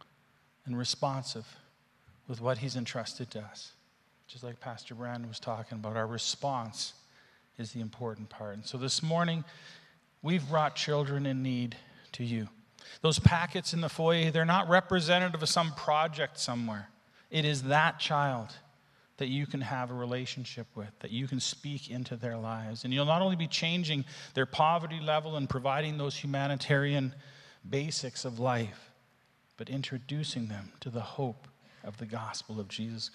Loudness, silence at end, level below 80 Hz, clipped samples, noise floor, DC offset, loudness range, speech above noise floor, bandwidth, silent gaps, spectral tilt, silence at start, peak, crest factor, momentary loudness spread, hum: -32 LUFS; 0.05 s; -62 dBFS; under 0.1%; -68 dBFS; under 0.1%; 11 LU; 36 dB; 12.5 kHz; none; -4.5 dB/octave; 0.65 s; -6 dBFS; 28 dB; 17 LU; none